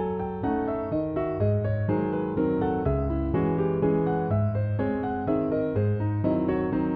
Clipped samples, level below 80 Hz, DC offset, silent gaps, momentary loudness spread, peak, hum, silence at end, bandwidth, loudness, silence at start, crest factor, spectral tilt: under 0.1%; -42 dBFS; under 0.1%; none; 3 LU; -12 dBFS; none; 0 s; 4.3 kHz; -26 LUFS; 0 s; 14 dB; -9.5 dB/octave